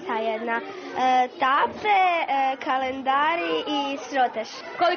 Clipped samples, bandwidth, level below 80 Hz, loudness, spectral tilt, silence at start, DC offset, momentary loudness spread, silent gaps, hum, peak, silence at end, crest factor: under 0.1%; 6.6 kHz; -68 dBFS; -24 LUFS; 0 dB/octave; 0 s; under 0.1%; 7 LU; none; none; -10 dBFS; 0 s; 14 dB